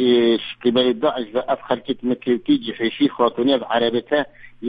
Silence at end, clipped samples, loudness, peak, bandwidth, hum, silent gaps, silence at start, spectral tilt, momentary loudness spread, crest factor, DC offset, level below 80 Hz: 0 s; under 0.1%; -20 LUFS; -4 dBFS; 5 kHz; none; none; 0 s; -8 dB/octave; 6 LU; 16 dB; under 0.1%; -58 dBFS